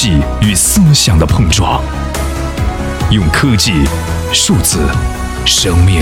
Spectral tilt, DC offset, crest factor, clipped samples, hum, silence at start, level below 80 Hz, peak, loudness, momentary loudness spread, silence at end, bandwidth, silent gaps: -4 dB/octave; under 0.1%; 10 dB; under 0.1%; none; 0 s; -18 dBFS; 0 dBFS; -11 LUFS; 9 LU; 0 s; 17 kHz; none